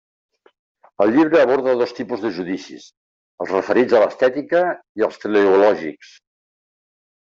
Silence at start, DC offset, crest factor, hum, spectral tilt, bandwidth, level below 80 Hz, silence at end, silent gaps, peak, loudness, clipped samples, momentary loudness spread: 1 s; under 0.1%; 16 dB; none; -6 dB/octave; 7.4 kHz; -64 dBFS; 1.3 s; 2.97-3.38 s, 4.89-4.95 s; -4 dBFS; -18 LUFS; under 0.1%; 13 LU